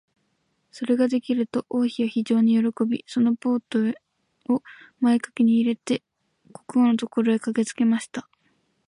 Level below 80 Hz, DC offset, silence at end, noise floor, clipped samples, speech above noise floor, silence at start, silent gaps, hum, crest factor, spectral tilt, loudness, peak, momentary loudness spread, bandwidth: -74 dBFS; under 0.1%; 0.65 s; -71 dBFS; under 0.1%; 49 dB; 0.75 s; none; none; 14 dB; -6 dB/octave; -23 LUFS; -10 dBFS; 7 LU; 11 kHz